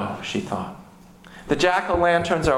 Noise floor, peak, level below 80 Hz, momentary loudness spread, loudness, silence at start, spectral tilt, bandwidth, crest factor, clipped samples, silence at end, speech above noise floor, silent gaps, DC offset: -47 dBFS; -6 dBFS; -42 dBFS; 13 LU; -22 LUFS; 0 s; -5 dB/octave; 15.5 kHz; 18 dB; under 0.1%; 0 s; 26 dB; none; under 0.1%